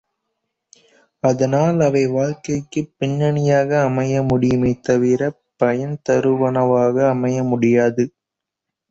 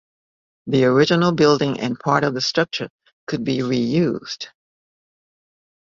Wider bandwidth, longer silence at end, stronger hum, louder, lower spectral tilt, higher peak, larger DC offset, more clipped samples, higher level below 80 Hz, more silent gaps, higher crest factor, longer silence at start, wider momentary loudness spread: about the same, 8 kHz vs 7.6 kHz; second, 0.8 s vs 1.5 s; neither; about the same, -18 LUFS vs -19 LUFS; first, -7.5 dB/octave vs -5.5 dB/octave; about the same, -4 dBFS vs -2 dBFS; neither; neither; first, -50 dBFS vs -58 dBFS; second, none vs 2.90-2.99 s, 3.13-3.27 s; about the same, 14 dB vs 18 dB; first, 1.25 s vs 0.65 s; second, 7 LU vs 16 LU